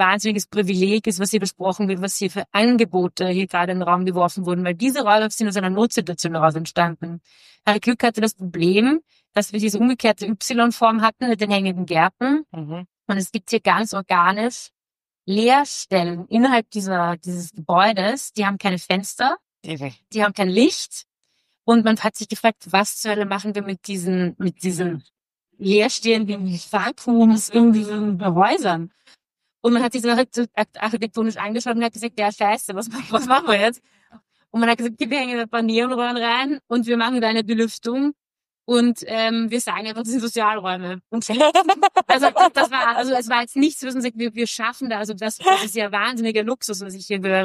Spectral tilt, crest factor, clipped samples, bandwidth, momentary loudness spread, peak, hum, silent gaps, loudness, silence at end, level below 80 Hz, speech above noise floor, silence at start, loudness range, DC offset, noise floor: -4.5 dB/octave; 18 dB; under 0.1%; 15 kHz; 10 LU; -2 dBFS; none; none; -20 LUFS; 0 s; -68 dBFS; over 70 dB; 0 s; 4 LU; under 0.1%; under -90 dBFS